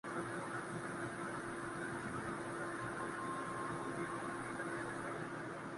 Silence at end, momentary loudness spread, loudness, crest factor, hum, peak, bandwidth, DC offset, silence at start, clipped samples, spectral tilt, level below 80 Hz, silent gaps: 0 s; 2 LU; -43 LUFS; 14 dB; none; -30 dBFS; 11.5 kHz; under 0.1%; 0.05 s; under 0.1%; -5 dB/octave; -70 dBFS; none